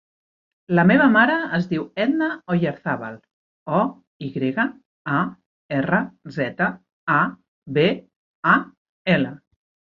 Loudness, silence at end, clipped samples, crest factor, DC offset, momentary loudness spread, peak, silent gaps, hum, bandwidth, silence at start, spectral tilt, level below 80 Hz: -21 LUFS; 0.65 s; under 0.1%; 20 dB; under 0.1%; 14 LU; -2 dBFS; 3.33-3.66 s, 4.07-4.20 s, 4.85-5.05 s, 5.46-5.69 s, 6.93-7.07 s, 7.48-7.62 s, 8.16-8.43 s, 8.77-9.05 s; none; 5.8 kHz; 0.7 s; -8.5 dB/octave; -60 dBFS